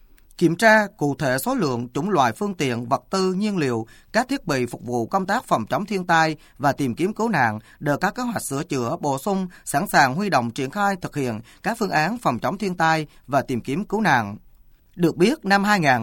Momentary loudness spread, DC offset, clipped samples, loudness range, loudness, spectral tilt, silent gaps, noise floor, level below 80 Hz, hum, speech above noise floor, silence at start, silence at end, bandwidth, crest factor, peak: 8 LU; under 0.1%; under 0.1%; 2 LU; -22 LUFS; -5 dB/octave; none; -51 dBFS; -52 dBFS; none; 30 dB; 0.4 s; 0 s; 18.5 kHz; 20 dB; -2 dBFS